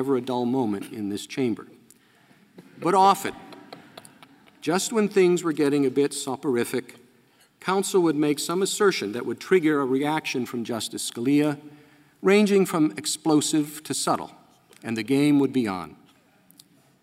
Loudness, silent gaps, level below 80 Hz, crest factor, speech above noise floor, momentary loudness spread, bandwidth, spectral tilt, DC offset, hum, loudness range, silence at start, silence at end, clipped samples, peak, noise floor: -24 LUFS; none; -72 dBFS; 18 dB; 36 dB; 13 LU; 16 kHz; -4.5 dB/octave; under 0.1%; none; 3 LU; 0 s; 1.1 s; under 0.1%; -6 dBFS; -60 dBFS